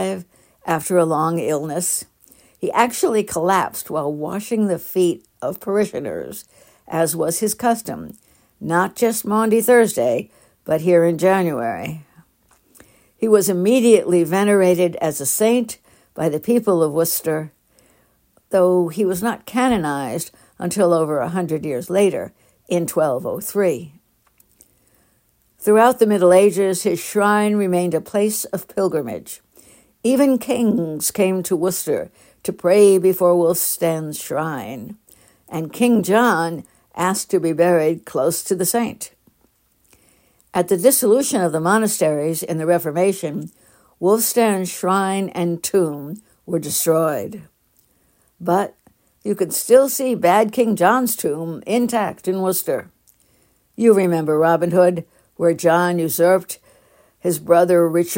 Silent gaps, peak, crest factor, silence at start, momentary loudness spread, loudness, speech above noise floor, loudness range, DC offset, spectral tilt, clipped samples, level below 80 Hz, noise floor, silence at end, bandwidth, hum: none; -2 dBFS; 18 dB; 0 s; 14 LU; -18 LUFS; 44 dB; 5 LU; under 0.1%; -5 dB/octave; under 0.1%; -60 dBFS; -61 dBFS; 0 s; 16.5 kHz; none